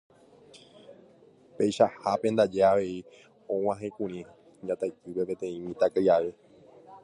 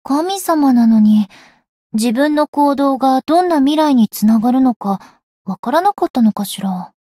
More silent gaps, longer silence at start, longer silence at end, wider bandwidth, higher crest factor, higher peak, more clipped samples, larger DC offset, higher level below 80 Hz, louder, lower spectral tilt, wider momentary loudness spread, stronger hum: second, none vs 1.69-1.90 s, 2.48-2.53 s, 4.76-4.80 s, 5.23-5.45 s, 5.59-5.63 s, 6.10-6.14 s; first, 0.55 s vs 0.05 s; second, 0.05 s vs 0.2 s; second, 11.5 kHz vs 15.5 kHz; first, 20 dB vs 10 dB; second, -8 dBFS vs -4 dBFS; neither; neither; second, -66 dBFS vs -58 dBFS; second, -28 LUFS vs -14 LUFS; about the same, -6 dB/octave vs -6 dB/octave; about the same, 13 LU vs 11 LU; neither